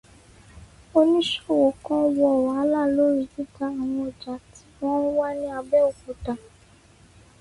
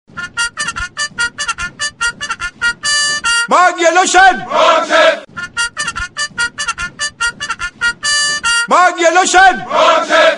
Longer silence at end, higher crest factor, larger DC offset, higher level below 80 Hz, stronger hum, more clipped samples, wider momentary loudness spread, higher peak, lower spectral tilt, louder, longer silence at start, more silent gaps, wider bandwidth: first, 1.05 s vs 0 s; about the same, 16 dB vs 14 dB; second, under 0.1% vs 0.2%; second, -54 dBFS vs -42 dBFS; neither; neither; about the same, 13 LU vs 11 LU; second, -8 dBFS vs 0 dBFS; first, -5.5 dB/octave vs -1 dB/octave; second, -23 LUFS vs -12 LUFS; first, 0.55 s vs 0.15 s; neither; about the same, 11.5 kHz vs 11.5 kHz